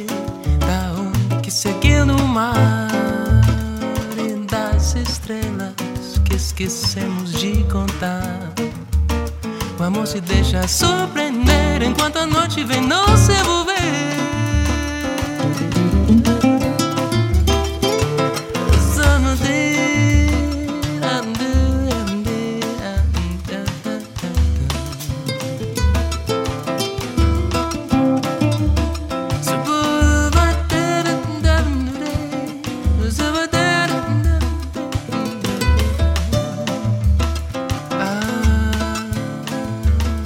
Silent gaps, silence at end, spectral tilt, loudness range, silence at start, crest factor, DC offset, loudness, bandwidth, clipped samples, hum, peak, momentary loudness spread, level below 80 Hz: none; 0 s; -5 dB/octave; 5 LU; 0 s; 18 dB; under 0.1%; -18 LUFS; 16.5 kHz; under 0.1%; none; 0 dBFS; 9 LU; -22 dBFS